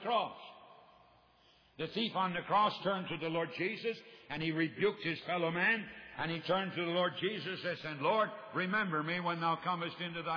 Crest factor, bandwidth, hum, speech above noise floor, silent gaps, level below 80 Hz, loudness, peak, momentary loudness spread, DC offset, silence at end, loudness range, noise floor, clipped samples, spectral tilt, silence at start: 16 dB; 5.4 kHz; none; 31 dB; none; -74 dBFS; -35 LUFS; -20 dBFS; 9 LU; under 0.1%; 0 s; 2 LU; -67 dBFS; under 0.1%; -7 dB/octave; 0 s